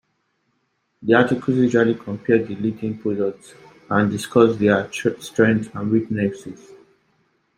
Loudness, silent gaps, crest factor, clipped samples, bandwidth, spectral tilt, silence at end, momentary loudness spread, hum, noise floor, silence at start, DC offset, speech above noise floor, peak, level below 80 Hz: -20 LUFS; none; 18 dB; under 0.1%; 15 kHz; -6.5 dB/octave; 1.05 s; 9 LU; none; -70 dBFS; 1 s; under 0.1%; 50 dB; -2 dBFS; -60 dBFS